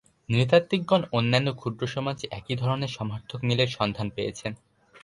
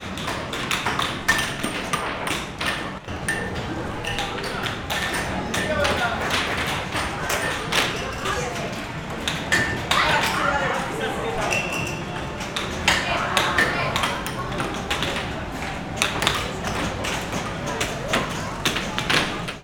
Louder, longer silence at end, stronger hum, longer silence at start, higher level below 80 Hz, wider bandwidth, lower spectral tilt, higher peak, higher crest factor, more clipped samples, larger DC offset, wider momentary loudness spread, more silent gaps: about the same, -26 LUFS vs -24 LUFS; about the same, 0.05 s vs 0 s; neither; first, 0.3 s vs 0 s; second, -56 dBFS vs -42 dBFS; second, 11.5 kHz vs over 20 kHz; first, -6 dB/octave vs -3 dB/octave; second, -8 dBFS vs 0 dBFS; about the same, 20 dB vs 24 dB; neither; neither; first, 12 LU vs 8 LU; neither